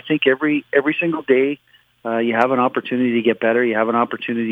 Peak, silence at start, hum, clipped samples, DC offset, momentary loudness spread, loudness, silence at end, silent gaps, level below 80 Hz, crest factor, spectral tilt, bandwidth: 0 dBFS; 0.05 s; none; under 0.1%; under 0.1%; 6 LU; -18 LUFS; 0 s; none; -70 dBFS; 18 dB; -7.5 dB/octave; 5.8 kHz